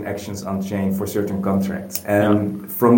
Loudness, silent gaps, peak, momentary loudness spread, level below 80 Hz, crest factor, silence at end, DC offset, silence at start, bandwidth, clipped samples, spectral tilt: -21 LUFS; none; -2 dBFS; 9 LU; -54 dBFS; 18 dB; 0 s; under 0.1%; 0 s; 17 kHz; under 0.1%; -6.5 dB/octave